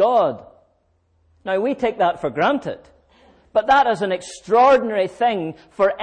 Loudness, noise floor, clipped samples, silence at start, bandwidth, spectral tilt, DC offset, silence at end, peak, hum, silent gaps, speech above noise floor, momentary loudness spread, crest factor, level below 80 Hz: -19 LUFS; -63 dBFS; under 0.1%; 0 s; 9.8 kHz; -5 dB/octave; under 0.1%; 0 s; -6 dBFS; none; none; 45 dB; 14 LU; 14 dB; -56 dBFS